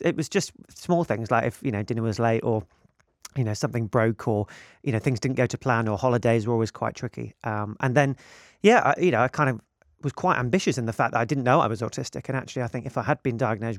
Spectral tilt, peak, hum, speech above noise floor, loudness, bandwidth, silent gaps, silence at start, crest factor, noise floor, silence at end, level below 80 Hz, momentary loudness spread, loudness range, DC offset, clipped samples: -6 dB/octave; -4 dBFS; none; 26 dB; -25 LUFS; 14 kHz; none; 0 s; 20 dB; -50 dBFS; 0 s; -60 dBFS; 10 LU; 4 LU; under 0.1%; under 0.1%